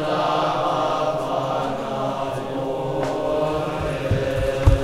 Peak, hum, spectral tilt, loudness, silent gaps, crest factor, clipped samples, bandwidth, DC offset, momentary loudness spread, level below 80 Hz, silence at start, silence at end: -2 dBFS; none; -6.5 dB/octave; -23 LUFS; none; 20 dB; under 0.1%; 15.5 kHz; under 0.1%; 5 LU; -32 dBFS; 0 s; 0 s